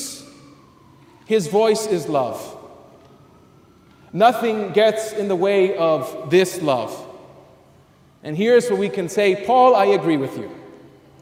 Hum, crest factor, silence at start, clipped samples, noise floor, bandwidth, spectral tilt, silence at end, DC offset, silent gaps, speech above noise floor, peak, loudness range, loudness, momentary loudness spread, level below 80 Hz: none; 18 dB; 0 s; under 0.1%; -52 dBFS; 16 kHz; -5 dB/octave; 0.45 s; under 0.1%; none; 34 dB; -2 dBFS; 5 LU; -18 LUFS; 17 LU; -64 dBFS